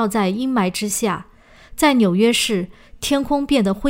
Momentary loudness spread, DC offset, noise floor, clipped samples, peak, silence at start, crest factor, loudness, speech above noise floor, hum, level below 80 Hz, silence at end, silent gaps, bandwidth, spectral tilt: 12 LU; under 0.1%; -42 dBFS; under 0.1%; -2 dBFS; 0 s; 18 dB; -19 LUFS; 24 dB; none; -44 dBFS; 0 s; none; 16 kHz; -4.5 dB/octave